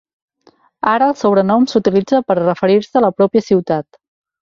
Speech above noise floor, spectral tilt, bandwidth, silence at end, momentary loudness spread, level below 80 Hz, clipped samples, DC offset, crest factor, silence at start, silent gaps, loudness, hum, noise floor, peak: 40 dB; -7 dB/octave; 7.6 kHz; 0.6 s; 4 LU; -56 dBFS; under 0.1%; under 0.1%; 14 dB; 0.85 s; none; -14 LUFS; none; -53 dBFS; -2 dBFS